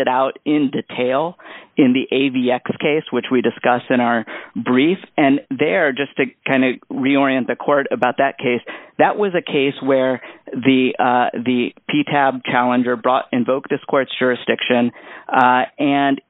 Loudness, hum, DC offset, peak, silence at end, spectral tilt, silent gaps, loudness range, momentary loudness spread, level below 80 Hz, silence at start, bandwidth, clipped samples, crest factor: -18 LUFS; none; under 0.1%; 0 dBFS; 0.1 s; -3.5 dB/octave; none; 1 LU; 6 LU; -66 dBFS; 0 s; 4 kHz; under 0.1%; 18 dB